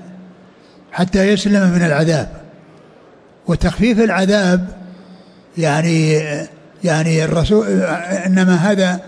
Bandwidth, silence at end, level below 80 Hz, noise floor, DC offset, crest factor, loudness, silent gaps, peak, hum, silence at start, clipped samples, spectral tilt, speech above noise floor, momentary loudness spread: 10.5 kHz; 0 s; -36 dBFS; -45 dBFS; under 0.1%; 12 dB; -15 LUFS; none; -4 dBFS; none; 0 s; under 0.1%; -6 dB/octave; 31 dB; 13 LU